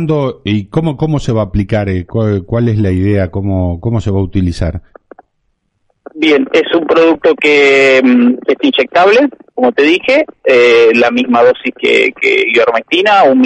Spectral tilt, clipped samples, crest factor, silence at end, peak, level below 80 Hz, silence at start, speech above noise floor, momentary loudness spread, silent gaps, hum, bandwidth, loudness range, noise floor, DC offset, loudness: -6.5 dB/octave; under 0.1%; 10 dB; 0 s; 0 dBFS; -34 dBFS; 0 s; 53 dB; 8 LU; none; none; 9.4 kHz; 7 LU; -63 dBFS; under 0.1%; -10 LUFS